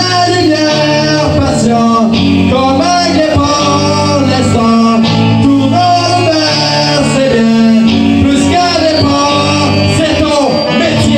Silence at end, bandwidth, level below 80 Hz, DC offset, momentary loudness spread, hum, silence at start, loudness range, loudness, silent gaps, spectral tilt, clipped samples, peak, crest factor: 0 s; 10 kHz; -36 dBFS; under 0.1%; 2 LU; none; 0 s; 1 LU; -9 LUFS; none; -5 dB/octave; under 0.1%; 0 dBFS; 8 dB